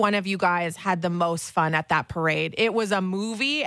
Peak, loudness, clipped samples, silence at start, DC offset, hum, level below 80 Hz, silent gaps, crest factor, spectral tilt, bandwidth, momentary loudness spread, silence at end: -8 dBFS; -24 LUFS; under 0.1%; 0 s; under 0.1%; none; -60 dBFS; none; 16 dB; -4.5 dB/octave; 11 kHz; 3 LU; 0 s